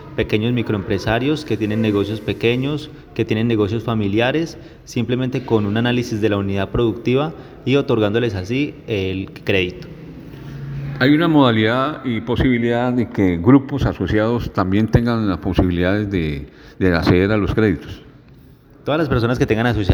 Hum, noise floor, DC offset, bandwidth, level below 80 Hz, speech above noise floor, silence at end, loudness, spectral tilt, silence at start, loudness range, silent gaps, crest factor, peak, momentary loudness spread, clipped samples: none; -45 dBFS; under 0.1%; 19.5 kHz; -36 dBFS; 27 dB; 0 s; -18 LUFS; -7.5 dB/octave; 0 s; 3 LU; none; 18 dB; 0 dBFS; 13 LU; under 0.1%